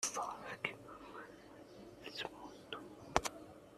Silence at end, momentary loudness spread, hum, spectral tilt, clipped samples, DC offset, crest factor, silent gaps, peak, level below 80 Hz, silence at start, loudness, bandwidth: 0 s; 17 LU; none; -2 dB/octave; under 0.1%; under 0.1%; 36 dB; none; -10 dBFS; -64 dBFS; 0 s; -44 LUFS; 14 kHz